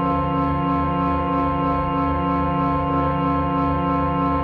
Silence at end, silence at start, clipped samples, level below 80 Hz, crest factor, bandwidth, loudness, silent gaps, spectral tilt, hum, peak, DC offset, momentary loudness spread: 0 s; 0 s; under 0.1%; -34 dBFS; 14 dB; 5 kHz; -21 LUFS; none; -10 dB/octave; none; -6 dBFS; 0.2%; 1 LU